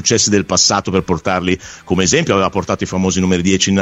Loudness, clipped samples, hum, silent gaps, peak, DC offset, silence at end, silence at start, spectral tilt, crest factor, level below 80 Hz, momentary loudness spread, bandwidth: -15 LUFS; under 0.1%; none; none; 0 dBFS; under 0.1%; 0 s; 0 s; -3.5 dB/octave; 14 dB; -42 dBFS; 7 LU; 8.4 kHz